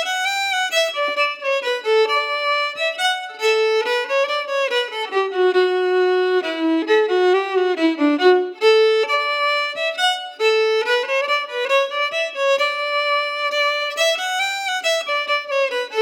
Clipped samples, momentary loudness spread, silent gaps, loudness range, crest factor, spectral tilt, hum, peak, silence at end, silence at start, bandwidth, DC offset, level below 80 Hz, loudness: under 0.1%; 4 LU; none; 2 LU; 14 dB; 0 dB/octave; none; -4 dBFS; 0 s; 0 s; 18 kHz; under 0.1%; under -90 dBFS; -18 LUFS